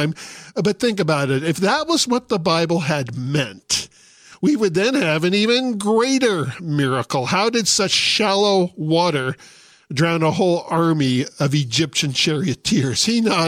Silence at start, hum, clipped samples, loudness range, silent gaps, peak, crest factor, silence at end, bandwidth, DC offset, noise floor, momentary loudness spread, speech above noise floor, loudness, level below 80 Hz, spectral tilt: 0 s; none; under 0.1%; 2 LU; none; -4 dBFS; 16 dB; 0 s; 16 kHz; under 0.1%; -47 dBFS; 7 LU; 29 dB; -18 LUFS; -56 dBFS; -4 dB/octave